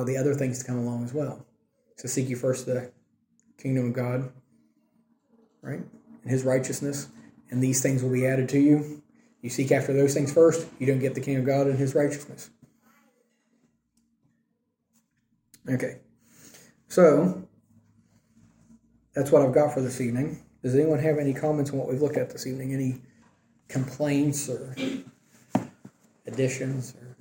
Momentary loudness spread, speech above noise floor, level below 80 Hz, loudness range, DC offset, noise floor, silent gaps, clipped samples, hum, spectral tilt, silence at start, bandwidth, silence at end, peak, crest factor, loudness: 18 LU; 51 dB; -66 dBFS; 9 LU; under 0.1%; -76 dBFS; none; under 0.1%; none; -6.5 dB/octave; 0 s; 17 kHz; 0.1 s; -6 dBFS; 22 dB; -26 LUFS